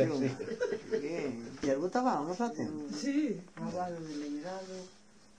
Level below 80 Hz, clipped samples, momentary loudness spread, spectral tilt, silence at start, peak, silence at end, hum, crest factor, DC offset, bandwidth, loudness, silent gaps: -70 dBFS; under 0.1%; 9 LU; -6 dB/octave; 0 s; -16 dBFS; 0.45 s; none; 18 dB; under 0.1%; 10 kHz; -35 LUFS; none